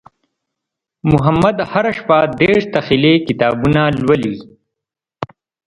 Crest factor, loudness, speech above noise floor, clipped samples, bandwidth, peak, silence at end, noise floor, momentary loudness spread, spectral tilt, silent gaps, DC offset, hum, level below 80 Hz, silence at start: 16 dB; -14 LUFS; 70 dB; under 0.1%; 11 kHz; 0 dBFS; 0.4 s; -83 dBFS; 18 LU; -7.5 dB/octave; none; under 0.1%; none; -40 dBFS; 1.05 s